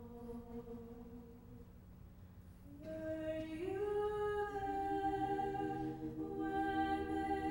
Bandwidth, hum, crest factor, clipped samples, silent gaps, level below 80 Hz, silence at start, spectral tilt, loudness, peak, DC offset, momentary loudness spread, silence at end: 16 kHz; none; 14 dB; under 0.1%; none; -58 dBFS; 0 s; -7 dB/octave; -41 LUFS; -26 dBFS; under 0.1%; 20 LU; 0 s